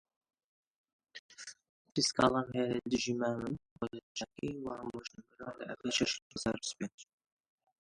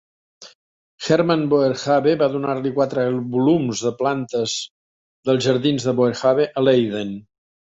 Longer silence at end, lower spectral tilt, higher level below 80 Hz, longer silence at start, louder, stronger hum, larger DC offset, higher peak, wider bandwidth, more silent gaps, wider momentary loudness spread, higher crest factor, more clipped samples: first, 0.8 s vs 0.55 s; second, -3.5 dB/octave vs -5.5 dB/octave; second, -66 dBFS vs -60 dBFS; first, 1.15 s vs 0.4 s; second, -36 LUFS vs -19 LUFS; neither; neither; second, -12 dBFS vs -4 dBFS; first, 11.5 kHz vs 8 kHz; second, 1.19-1.29 s, 1.69-1.85 s, 3.71-3.76 s, 4.03-4.15 s, 6.22-6.30 s, 6.94-6.98 s vs 0.55-0.98 s, 4.70-5.23 s; first, 19 LU vs 9 LU; first, 26 dB vs 16 dB; neither